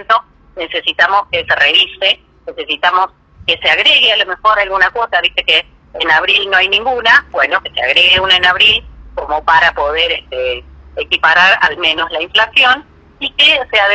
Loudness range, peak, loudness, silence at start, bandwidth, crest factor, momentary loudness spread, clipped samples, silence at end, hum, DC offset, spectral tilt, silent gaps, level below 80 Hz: 2 LU; 0 dBFS; -10 LUFS; 0 s; 9.4 kHz; 12 dB; 12 LU; under 0.1%; 0 s; none; under 0.1%; -2 dB/octave; none; -40 dBFS